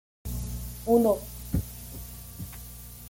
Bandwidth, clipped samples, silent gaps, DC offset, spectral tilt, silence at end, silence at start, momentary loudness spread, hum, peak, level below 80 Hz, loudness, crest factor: 17 kHz; under 0.1%; none; under 0.1%; -6.5 dB/octave; 0 s; 0.25 s; 18 LU; 60 Hz at -40 dBFS; -10 dBFS; -42 dBFS; -28 LUFS; 20 dB